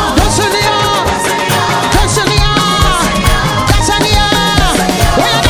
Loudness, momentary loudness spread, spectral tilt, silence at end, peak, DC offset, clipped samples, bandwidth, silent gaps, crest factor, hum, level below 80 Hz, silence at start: -10 LUFS; 2 LU; -3.5 dB/octave; 0 s; 0 dBFS; under 0.1%; 0.5%; 18.5 kHz; none; 10 dB; none; -18 dBFS; 0 s